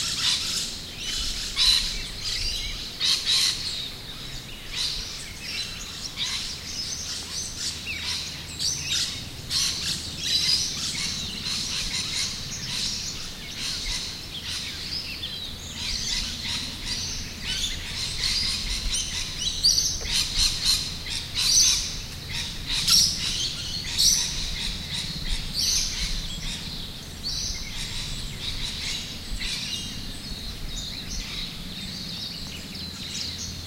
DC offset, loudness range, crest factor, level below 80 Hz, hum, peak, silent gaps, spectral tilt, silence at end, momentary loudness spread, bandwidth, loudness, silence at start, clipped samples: under 0.1%; 9 LU; 22 dB; -38 dBFS; none; -6 dBFS; none; -0.5 dB/octave; 0 s; 13 LU; 16 kHz; -25 LUFS; 0 s; under 0.1%